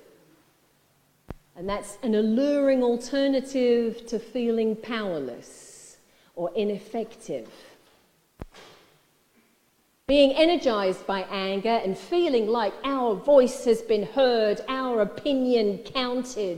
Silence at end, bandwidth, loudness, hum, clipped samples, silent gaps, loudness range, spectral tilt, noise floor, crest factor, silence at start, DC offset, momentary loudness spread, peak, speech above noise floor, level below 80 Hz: 0 s; 15.5 kHz; -25 LUFS; none; under 0.1%; none; 12 LU; -5 dB/octave; -66 dBFS; 20 dB; 1.3 s; under 0.1%; 16 LU; -6 dBFS; 42 dB; -56 dBFS